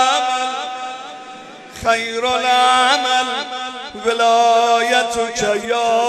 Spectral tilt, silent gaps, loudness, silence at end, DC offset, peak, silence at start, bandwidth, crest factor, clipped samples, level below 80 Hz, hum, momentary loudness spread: -1.5 dB/octave; none; -16 LUFS; 0 s; under 0.1%; 0 dBFS; 0 s; 13.5 kHz; 16 dB; under 0.1%; -54 dBFS; none; 17 LU